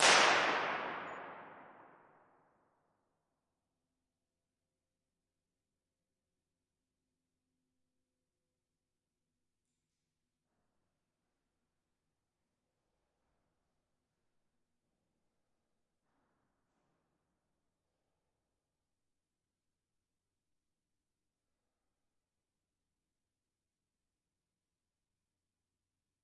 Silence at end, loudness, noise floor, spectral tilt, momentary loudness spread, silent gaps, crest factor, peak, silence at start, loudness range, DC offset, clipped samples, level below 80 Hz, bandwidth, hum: 24.6 s; -30 LUFS; under -90 dBFS; 1.5 dB/octave; 24 LU; none; 34 dB; -10 dBFS; 0 s; 24 LU; under 0.1%; under 0.1%; -88 dBFS; 5.4 kHz; none